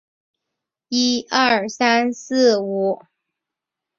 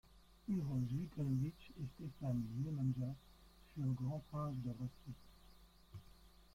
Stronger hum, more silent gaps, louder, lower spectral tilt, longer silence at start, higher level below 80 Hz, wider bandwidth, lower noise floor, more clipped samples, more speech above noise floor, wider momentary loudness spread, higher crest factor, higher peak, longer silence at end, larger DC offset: neither; neither; first, -18 LUFS vs -43 LUFS; second, -3 dB/octave vs -9 dB/octave; first, 0.9 s vs 0.1 s; about the same, -68 dBFS vs -64 dBFS; second, 7.4 kHz vs 15 kHz; first, -85 dBFS vs -64 dBFS; neither; first, 66 dB vs 22 dB; second, 7 LU vs 16 LU; first, 20 dB vs 14 dB; first, -2 dBFS vs -28 dBFS; first, 1.05 s vs 0.1 s; neither